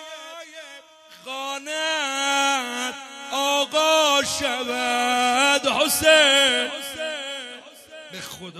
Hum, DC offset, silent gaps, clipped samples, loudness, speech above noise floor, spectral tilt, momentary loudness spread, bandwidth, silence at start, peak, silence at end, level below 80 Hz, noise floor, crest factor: none; under 0.1%; none; under 0.1%; -20 LUFS; 25 dB; -0.5 dB/octave; 22 LU; 14 kHz; 0 s; -2 dBFS; 0 s; -60 dBFS; -47 dBFS; 20 dB